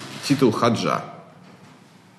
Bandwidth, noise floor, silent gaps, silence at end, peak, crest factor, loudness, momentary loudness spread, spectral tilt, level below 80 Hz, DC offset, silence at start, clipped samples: 13 kHz; -49 dBFS; none; 0.95 s; -6 dBFS; 18 dB; -21 LUFS; 9 LU; -5.5 dB/octave; -68 dBFS; under 0.1%; 0 s; under 0.1%